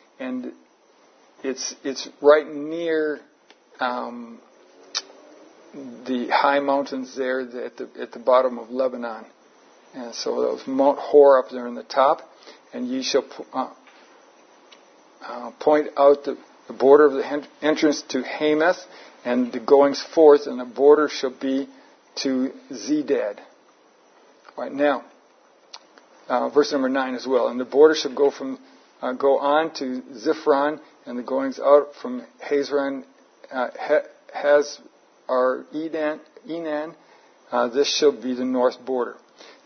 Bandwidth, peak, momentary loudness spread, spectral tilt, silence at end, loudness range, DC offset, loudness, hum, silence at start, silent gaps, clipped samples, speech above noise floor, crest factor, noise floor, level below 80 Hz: 6.6 kHz; -2 dBFS; 18 LU; -3.5 dB/octave; 0.5 s; 8 LU; under 0.1%; -22 LUFS; none; 0.2 s; none; under 0.1%; 35 dB; 20 dB; -57 dBFS; -82 dBFS